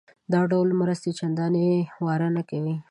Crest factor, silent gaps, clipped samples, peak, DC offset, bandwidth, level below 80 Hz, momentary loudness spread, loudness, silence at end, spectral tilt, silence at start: 14 dB; none; under 0.1%; -10 dBFS; under 0.1%; 10.5 kHz; -70 dBFS; 6 LU; -25 LUFS; 0.1 s; -8 dB/octave; 0.3 s